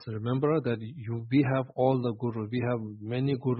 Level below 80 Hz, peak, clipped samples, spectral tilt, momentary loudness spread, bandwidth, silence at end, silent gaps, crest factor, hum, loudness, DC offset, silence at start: -64 dBFS; -12 dBFS; under 0.1%; -12 dB/octave; 8 LU; 5.6 kHz; 0 s; none; 16 dB; none; -29 LUFS; under 0.1%; 0 s